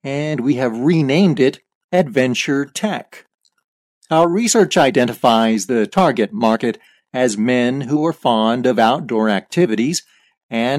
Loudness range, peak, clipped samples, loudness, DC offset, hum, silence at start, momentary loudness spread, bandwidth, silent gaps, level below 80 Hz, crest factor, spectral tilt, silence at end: 3 LU; -2 dBFS; under 0.1%; -16 LUFS; under 0.1%; none; 0.05 s; 8 LU; 15 kHz; 1.75-1.89 s, 3.34-3.38 s, 3.64-4.01 s, 10.37-10.49 s; -60 dBFS; 14 dB; -5 dB/octave; 0 s